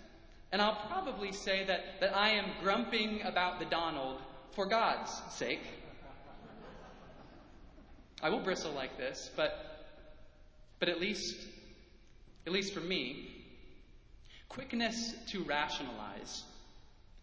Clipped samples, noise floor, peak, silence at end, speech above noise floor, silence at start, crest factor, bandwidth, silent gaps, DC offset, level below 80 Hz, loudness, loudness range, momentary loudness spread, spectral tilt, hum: under 0.1%; -59 dBFS; -14 dBFS; 0 s; 22 dB; 0 s; 24 dB; 8 kHz; none; under 0.1%; -60 dBFS; -36 LUFS; 8 LU; 22 LU; -3.5 dB/octave; none